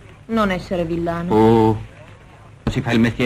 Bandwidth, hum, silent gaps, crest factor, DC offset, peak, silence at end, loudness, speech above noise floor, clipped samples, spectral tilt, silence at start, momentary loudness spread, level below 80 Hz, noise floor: 14.5 kHz; none; none; 18 dB; under 0.1%; -2 dBFS; 0 s; -19 LUFS; 26 dB; under 0.1%; -7.5 dB/octave; 0.3 s; 12 LU; -38 dBFS; -43 dBFS